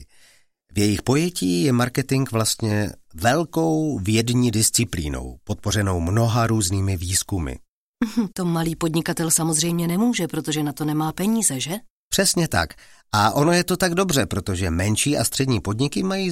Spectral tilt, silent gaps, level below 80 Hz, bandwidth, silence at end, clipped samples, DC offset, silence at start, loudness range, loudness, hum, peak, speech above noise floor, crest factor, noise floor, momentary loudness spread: -4.5 dB/octave; 7.68-7.94 s, 11.90-12.11 s; -44 dBFS; 16.5 kHz; 0 s; under 0.1%; under 0.1%; 0 s; 2 LU; -21 LUFS; none; -2 dBFS; 35 dB; 18 dB; -56 dBFS; 8 LU